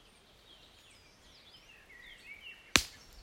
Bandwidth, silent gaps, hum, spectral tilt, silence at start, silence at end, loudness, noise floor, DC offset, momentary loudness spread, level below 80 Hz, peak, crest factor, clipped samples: 16 kHz; none; none; -1 dB/octave; 2.05 s; 0 s; -31 LUFS; -61 dBFS; under 0.1%; 28 LU; -56 dBFS; -2 dBFS; 40 dB; under 0.1%